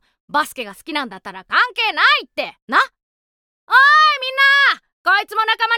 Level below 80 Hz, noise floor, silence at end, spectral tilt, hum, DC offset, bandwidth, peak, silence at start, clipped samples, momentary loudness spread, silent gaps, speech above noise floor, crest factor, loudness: -68 dBFS; under -90 dBFS; 0 s; -1 dB/octave; none; under 0.1%; 18 kHz; -2 dBFS; 0.35 s; under 0.1%; 15 LU; 2.62-2.68 s, 3.03-3.67 s, 4.93-5.05 s; over 73 dB; 16 dB; -15 LUFS